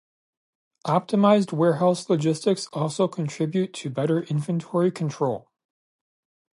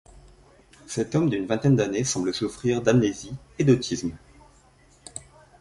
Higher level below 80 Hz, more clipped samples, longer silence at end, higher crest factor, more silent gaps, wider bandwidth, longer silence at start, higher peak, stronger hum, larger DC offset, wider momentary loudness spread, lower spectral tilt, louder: second, -72 dBFS vs -52 dBFS; neither; first, 1.15 s vs 0.4 s; about the same, 20 dB vs 20 dB; neither; about the same, 11.5 kHz vs 11.5 kHz; first, 0.85 s vs 0.15 s; about the same, -4 dBFS vs -4 dBFS; neither; neither; second, 8 LU vs 18 LU; about the same, -6.5 dB/octave vs -5.5 dB/octave; about the same, -24 LUFS vs -24 LUFS